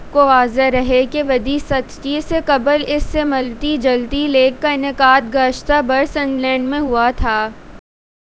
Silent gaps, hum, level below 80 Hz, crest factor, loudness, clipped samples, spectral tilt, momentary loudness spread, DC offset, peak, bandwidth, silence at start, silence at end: none; none; -32 dBFS; 16 dB; -16 LUFS; under 0.1%; -5 dB/octave; 7 LU; under 0.1%; 0 dBFS; 8 kHz; 0 s; 0.6 s